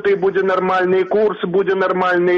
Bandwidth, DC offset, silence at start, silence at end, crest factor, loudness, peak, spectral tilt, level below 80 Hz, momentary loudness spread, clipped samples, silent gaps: 6.4 kHz; under 0.1%; 0 s; 0 s; 8 dB; -16 LUFS; -6 dBFS; -7.5 dB/octave; -58 dBFS; 2 LU; under 0.1%; none